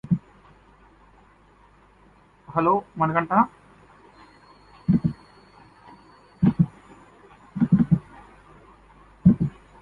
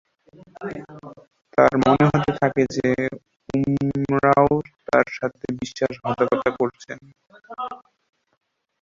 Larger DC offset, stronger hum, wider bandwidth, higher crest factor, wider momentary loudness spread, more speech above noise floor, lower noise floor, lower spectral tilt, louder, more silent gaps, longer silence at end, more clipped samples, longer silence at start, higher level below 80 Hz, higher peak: neither; neither; second, 4.7 kHz vs 7.6 kHz; about the same, 22 dB vs 22 dB; second, 10 LU vs 21 LU; first, 34 dB vs 30 dB; first, -55 dBFS vs -51 dBFS; first, -10.5 dB/octave vs -7 dB/octave; about the same, -23 LUFS vs -21 LUFS; neither; second, 0.3 s vs 1.05 s; neither; second, 0.1 s vs 0.6 s; about the same, -50 dBFS vs -52 dBFS; about the same, -4 dBFS vs -2 dBFS